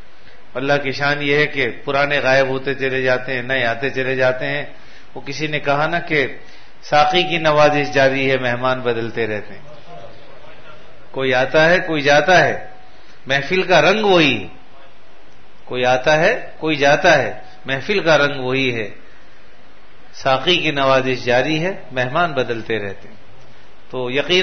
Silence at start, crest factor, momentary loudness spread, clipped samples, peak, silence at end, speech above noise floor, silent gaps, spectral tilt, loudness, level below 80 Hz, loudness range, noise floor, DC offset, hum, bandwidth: 0.55 s; 16 dB; 12 LU; under 0.1%; -2 dBFS; 0 s; 31 dB; none; -4.5 dB/octave; -17 LUFS; -48 dBFS; 5 LU; -48 dBFS; 4%; none; 6.6 kHz